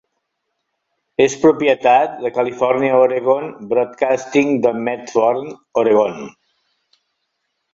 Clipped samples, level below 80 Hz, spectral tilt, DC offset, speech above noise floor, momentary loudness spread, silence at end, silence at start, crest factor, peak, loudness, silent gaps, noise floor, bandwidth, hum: under 0.1%; -62 dBFS; -5 dB/octave; under 0.1%; 58 dB; 9 LU; 1.45 s; 1.2 s; 18 dB; 0 dBFS; -16 LUFS; none; -74 dBFS; 7.8 kHz; none